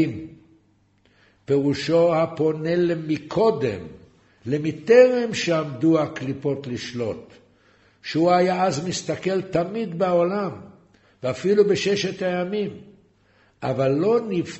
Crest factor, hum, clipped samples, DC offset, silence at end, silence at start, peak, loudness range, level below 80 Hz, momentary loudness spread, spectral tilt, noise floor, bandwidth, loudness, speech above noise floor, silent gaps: 20 dB; none; under 0.1%; under 0.1%; 0 s; 0 s; -2 dBFS; 4 LU; -60 dBFS; 12 LU; -6 dB/octave; -61 dBFS; 8.2 kHz; -22 LUFS; 40 dB; none